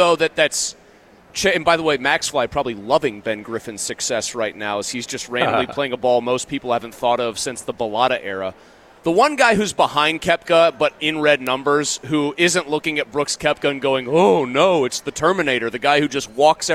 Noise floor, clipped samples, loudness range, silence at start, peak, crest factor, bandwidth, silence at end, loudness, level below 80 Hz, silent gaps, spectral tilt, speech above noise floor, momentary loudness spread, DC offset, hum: -49 dBFS; under 0.1%; 4 LU; 0 s; -2 dBFS; 16 dB; 16.5 kHz; 0 s; -19 LUFS; -52 dBFS; none; -3 dB/octave; 30 dB; 10 LU; under 0.1%; none